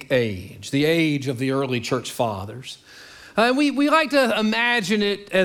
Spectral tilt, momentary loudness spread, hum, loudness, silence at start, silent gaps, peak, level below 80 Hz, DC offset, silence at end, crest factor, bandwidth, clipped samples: -5 dB/octave; 14 LU; none; -21 LUFS; 0 s; none; -4 dBFS; -60 dBFS; under 0.1%; 0 s; 18 dB; 18.5 kHz; under 0.1%